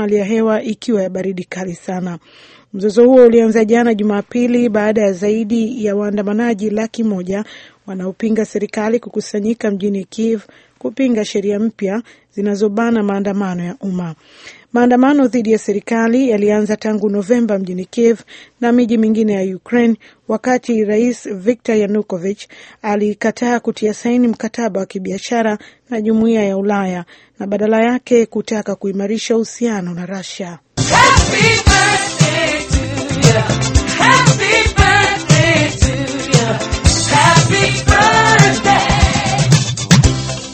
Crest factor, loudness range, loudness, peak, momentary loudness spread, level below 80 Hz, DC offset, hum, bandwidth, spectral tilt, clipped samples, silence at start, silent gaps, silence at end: 14 dB; 7 LU; -14 LUFS; 0 dBFS; 13 LU; -30 dBFS; under 0.1%; none; 9 kHz; -5 dB/octave; under 0.1%; 0 s; none; 0 s